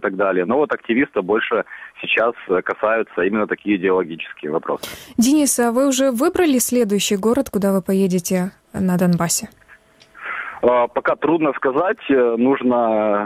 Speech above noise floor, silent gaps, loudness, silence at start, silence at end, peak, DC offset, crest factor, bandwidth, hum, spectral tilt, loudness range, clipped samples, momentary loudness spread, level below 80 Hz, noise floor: 31 dB; none; -18 LUFS; 0 s; 0 s; -2 dBFS; under 0.1%; 16 dB; 16.5 kHz; none; -4.5 dB/octave; 3 LU; under 0.1%; 9 LU; -54 dBFS; -49 dBFS